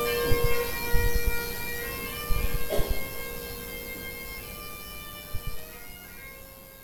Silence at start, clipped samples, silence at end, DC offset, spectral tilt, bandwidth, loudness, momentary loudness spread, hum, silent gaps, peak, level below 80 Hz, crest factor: 0 s; under 0.1%; 0 s; under 0.1%; -3.5 dB/octave; over 20 kHz; -32 LUFS; 15 LU; none; none; -8 dBFS; -34 dBFS; 20 dB